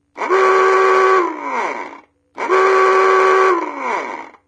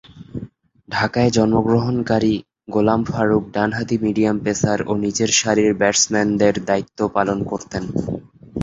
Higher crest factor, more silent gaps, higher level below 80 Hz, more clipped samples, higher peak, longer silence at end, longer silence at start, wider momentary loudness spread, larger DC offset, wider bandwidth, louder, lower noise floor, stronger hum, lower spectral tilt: about the same, 14 dB vs 18 dB; neither; second, -78 dBFS vs -46 dBFS; neither; about the same, -2 dBFS vs -2 dBFS; first, 0.2 s vs 0 s; about the same, 0.15 s vs 0.15 s; about the same, 12 LU vs 10 LU; neither; about the same, 8.6 kHz vs 8 kHz; first, -14 LUFS vs -19 LUFS; about the same, -41 dBFS vs -39 dBFS; neither; second, -2.5 dB/octave vs -4.5 dB/octave